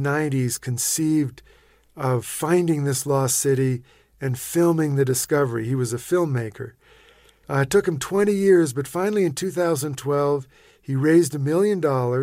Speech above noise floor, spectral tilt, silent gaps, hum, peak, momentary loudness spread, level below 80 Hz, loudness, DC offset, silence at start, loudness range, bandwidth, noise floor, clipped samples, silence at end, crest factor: 33 dB; -5.5 dB/octave; none; none; -6 dBFS; 9 LU; -58 dBFS; -22 LUFS; under 0.1%; 0 s; 2 LU; 16 kHz; -54 dBFS; under 0.1%; 0 s; 16 dB